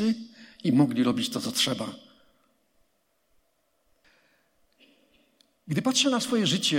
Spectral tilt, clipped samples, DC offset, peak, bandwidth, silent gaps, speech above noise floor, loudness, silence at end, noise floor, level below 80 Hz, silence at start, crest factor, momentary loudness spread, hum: -4 dB/octave; under 0.1%; under 0.1%; -10 dBFS; 16.5 kHz; none; 48 dB; -26 LUFS; 0 s; -73 dBFS; -72 dBFS; 0 s; 20 dB; 12 LU; none